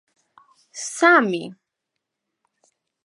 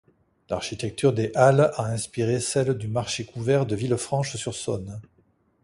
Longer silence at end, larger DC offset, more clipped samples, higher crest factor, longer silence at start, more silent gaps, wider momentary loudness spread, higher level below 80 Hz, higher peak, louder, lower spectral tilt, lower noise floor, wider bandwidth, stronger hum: first, 1.5 s vs 0.6 s; neither; neither; about the same, 22 dB vs 20 dB; first, 0.75 s vs 0.5 s; neither; first, 23 LU vs 11 LU; second, -82 dBFS vs -54 dBFS; about the same, -2 dBFS vs -4 dBFS; first, -18 LUFS vs -25 LUFS; second, -3.5 dB/octave vs -5.5 dB/octave; first, -81 dBFS vs -64 dBFS; about the same, 11.5 kHz vs 11.5 kHz; neither